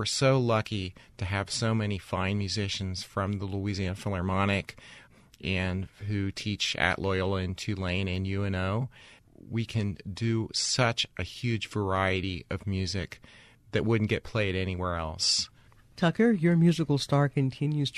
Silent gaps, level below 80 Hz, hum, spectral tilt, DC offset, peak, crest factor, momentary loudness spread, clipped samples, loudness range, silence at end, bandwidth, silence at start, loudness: none; -52 dBFS; none; -5 dB/octave; under 0.1%; -6 dBFS; 22 dB; 10 LU; under 0.1%; 5 LU; 0 s; 13 kHz; 0 s; -29 LUFS